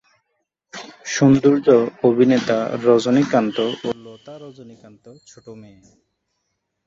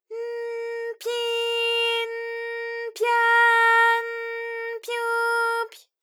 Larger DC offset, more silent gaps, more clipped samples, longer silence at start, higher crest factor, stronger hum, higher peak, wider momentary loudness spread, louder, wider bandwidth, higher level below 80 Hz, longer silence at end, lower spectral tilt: neither; neither; neither; first, 0.75 s vs 0.1 s; about the same, 18 dB vs 16 dB; neither; first, -2 dBFS vs -8 dBFS; first, 24 LU vs 14 LU; first, -17 LUFS vs -23 LUFS; second, 7.6 kHz vs 18.5 kHz; first, -60 dBFS vs under -90 dBFS; first, 1.25 s vs 0.25 s; first, -6 dB/octave vs 4 dB/octave